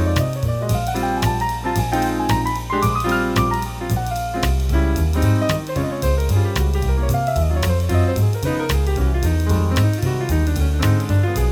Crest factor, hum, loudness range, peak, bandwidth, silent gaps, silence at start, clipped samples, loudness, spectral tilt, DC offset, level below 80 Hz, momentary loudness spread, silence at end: 14 dB; none; 1 LU; -4 dBFS; 18 kHz; none; 0 s; under 0.1%; -19 LUFS; -6 dB/octave; under 0.1%; -24 dBFS; 4 LU; 0 s